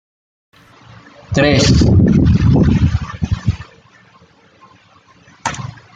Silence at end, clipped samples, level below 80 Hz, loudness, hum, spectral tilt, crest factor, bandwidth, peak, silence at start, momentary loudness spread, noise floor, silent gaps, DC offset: 0.25 s; under 0.1%; -28 dBFS; -14 LUFS; none; -6.5 dB/octave; 14 dB; 9.2 kHz; -2 dBFS; 1.3 s; 14 LU; -48 dBFS; none; under 0.1%